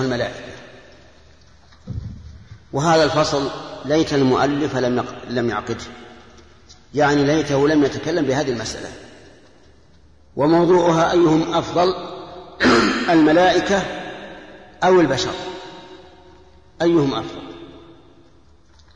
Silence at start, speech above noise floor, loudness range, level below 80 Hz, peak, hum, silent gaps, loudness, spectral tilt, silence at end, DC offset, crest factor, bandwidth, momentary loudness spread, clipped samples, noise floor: 0 s; 35 dB; 6 LU; -46 dBFS; -4 dBFS; none; none; -18 LUFS; -5.5 dB/octave; 1.2 s; 0.2%; 16 dB; 10.5 kHz; 21 LU; under 0.1%; -52 dBFS